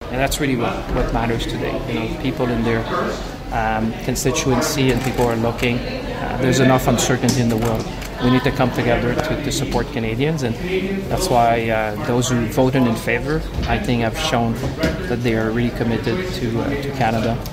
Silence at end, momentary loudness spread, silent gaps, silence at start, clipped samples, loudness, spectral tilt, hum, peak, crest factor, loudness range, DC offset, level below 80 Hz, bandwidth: 0 s; 6 LU; none; 0 s; under 0.1%; -19 LUFS; -5 dB/octave; none; 0 dBFS; 18 dB; 3 LU; under 0.1%; -32 dBFS; 16 kHz